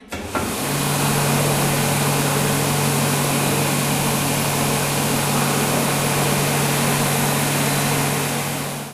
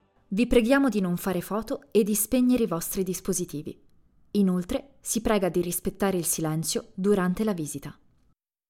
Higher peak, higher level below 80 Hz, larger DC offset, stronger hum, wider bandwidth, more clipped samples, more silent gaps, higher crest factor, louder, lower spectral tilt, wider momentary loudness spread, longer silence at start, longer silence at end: about the same, -6 dBFS vs -8 dBFS; about the same, -46 dBFS vs -48 dBFS; neither; neither; about the same, 16 kHz vs 17 kHz; neither; neither; second, 14 dB vs 20 dB; first, -19 LUFS vs -26 LUFS; about the same, -4 dB/octave vs -5 dB/octave; second, 3 LU vs 10 LU; second, 0 s vs 0.3 s; second, 0 s vs 0.75 s